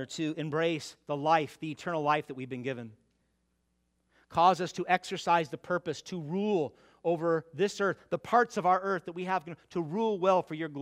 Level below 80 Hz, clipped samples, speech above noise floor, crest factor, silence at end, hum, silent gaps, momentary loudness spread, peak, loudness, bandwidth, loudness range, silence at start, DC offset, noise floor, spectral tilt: -74 dBFS; under 0.1%; 46 dB; 22 dB; 0 s; none; none; 11 LU; -10 dBFS; -31 LUFS; 14.5 kHz; 3 LU; 0 s; under 0.1%; -76 dBFS; -5.5 dB/octave